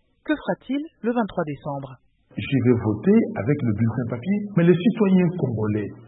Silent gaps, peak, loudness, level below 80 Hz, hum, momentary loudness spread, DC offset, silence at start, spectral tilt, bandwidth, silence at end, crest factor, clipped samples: none; -4 dBFS; -22 LUFS; -56 dBFS; none; 11 LU; under 0.1%; 0.25 s; -12.5 dB/octave; 4 kHz; 0.05 s; 18 dB; under 0.1%